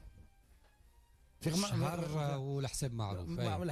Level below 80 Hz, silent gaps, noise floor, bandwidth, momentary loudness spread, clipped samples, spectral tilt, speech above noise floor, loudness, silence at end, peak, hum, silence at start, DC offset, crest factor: -58 dBFS; none; -65 dBFS; 14 kHz; 5 LU; under 0.1%; -5.5 dB/octave; 29 dB; -37 LUFS; 0 s; -24 dBFS; none; 0.05 s; under 0.1%; 14 dB